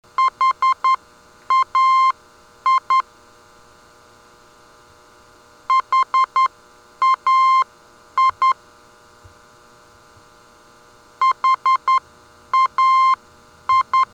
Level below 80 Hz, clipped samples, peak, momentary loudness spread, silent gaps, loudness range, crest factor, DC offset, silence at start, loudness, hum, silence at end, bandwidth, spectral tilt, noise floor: -62 dBFS; under 0.1%; -10 dBFS; 9 LU; none; 7 LU; 10 dB; under 0.1%; 0.2 s; -17 LUFS; none; 0.1 s; 9.2 kHz; -0.5 dB/octave; -49 dBFS